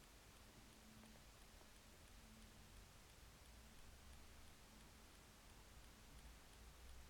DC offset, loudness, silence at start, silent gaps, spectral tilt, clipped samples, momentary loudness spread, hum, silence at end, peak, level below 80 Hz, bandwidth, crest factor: under 0.1%; -65 LUFS; 0 s; none; -3.5 dB/octave; under 0.1%; 1 LU; none; 0 s; -48 dBFS; -68 dBFS; 19 kHz; 16 dB